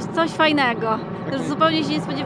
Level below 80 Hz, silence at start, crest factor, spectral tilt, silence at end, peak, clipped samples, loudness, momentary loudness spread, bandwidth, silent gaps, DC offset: -54 dBFS; 0 s; 18 dB; -5.5 dB/octave; 0 s; -2 dBFS; under 0.1%; -20 LUFS; 8 LU; 10.5 kHz; none; under 0.1%